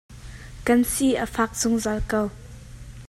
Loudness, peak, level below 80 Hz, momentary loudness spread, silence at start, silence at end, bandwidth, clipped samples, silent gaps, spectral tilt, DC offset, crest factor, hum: -23 LUFS; -6 dBFS; -40 dBFS; 22 LU; 0.1 s; 0.05 s; 15.5 kHz; under 0.1%; none; -4 dB/octave; under 0.1%; 18 dB; none